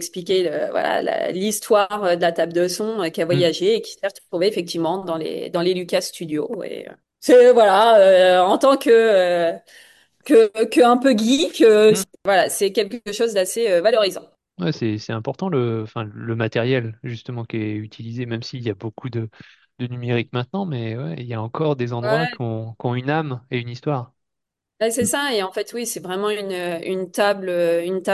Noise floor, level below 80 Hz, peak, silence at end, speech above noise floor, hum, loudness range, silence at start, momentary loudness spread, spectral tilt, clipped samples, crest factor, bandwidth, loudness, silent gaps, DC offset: -82 dBFS; -64 dBFS; -4 dBFS; 0 s; 63 dB; none; 11 LU; 0 s; 15 LU; -5 dB/octave; under 0.1%; 16 dB; 12.5 kHz; -19 LUFS; none; under 0.1%